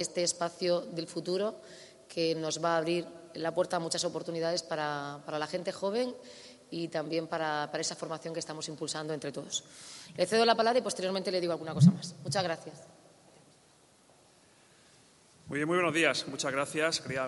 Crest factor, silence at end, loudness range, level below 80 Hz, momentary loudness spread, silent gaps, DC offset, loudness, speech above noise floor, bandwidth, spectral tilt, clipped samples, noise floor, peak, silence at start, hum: 22 dB; 0 s; 7 LU; -78 dBFS; 13 LU; none; under 0.1%; -32 LUFS; 31 dB; 11.5 kHz; -4.5 dB/octave; under 0.1%; -63 dBFS; -10 dBFS; 0 s; none